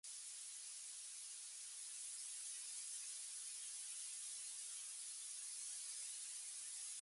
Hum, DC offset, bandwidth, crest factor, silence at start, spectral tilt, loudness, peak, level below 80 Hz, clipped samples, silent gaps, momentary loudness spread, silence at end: none; under 0.1%; 16 kHz; 14 dB; 0.05 s; 6.5 dB/octave; -48 LUFS; -38 dBFS; under -90 dBFS; under 0.1%; none; 3 LU; 0 s